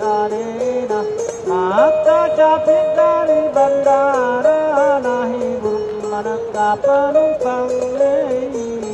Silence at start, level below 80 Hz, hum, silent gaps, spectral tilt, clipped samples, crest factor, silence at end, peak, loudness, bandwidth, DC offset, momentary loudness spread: 0 s; -52 dBFS; none; none; -5 dB/octave; under 0.1%; 14 dB; 0 s; -2 dBFS; -16 LUFS; 8.6 kHz; under 0.1%; 8 LU